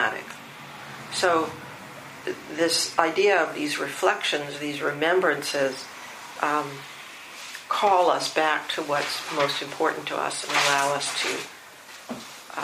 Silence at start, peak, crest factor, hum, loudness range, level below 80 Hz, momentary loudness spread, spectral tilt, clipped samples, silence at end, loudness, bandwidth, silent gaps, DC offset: 0 s; -2 dBFS; 24 dB; none; 3 LU; -74 dBFS; 18 LU; -2 dB/octave; under 0.1%; 0 s; -24 LUFS; 15.5 kHz; none; under 0.1%